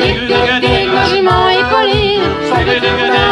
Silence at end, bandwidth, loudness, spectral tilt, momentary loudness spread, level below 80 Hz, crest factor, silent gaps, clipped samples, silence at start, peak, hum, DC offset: 0 s; 11 kHz; -11 LUFS; -5.5 dB/octave; 3 LU; -30 dBFS; 10 dB; none; under 0.1%; 0 s; 0 dBFS; none; under 0.1%